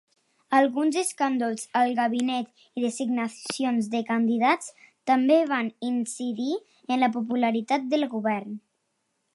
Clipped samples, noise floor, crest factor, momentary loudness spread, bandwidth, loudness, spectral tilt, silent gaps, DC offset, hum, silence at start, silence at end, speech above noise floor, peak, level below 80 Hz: under 0.1%; -76 dBFS; 18 dB; 9 LU; 12 kHz; -26 LUFS; -4 dB/octave; none; under 0.1%; none; 0.5 s; 0.75 s; 51 dB; -8 dBFS; -80 dBFS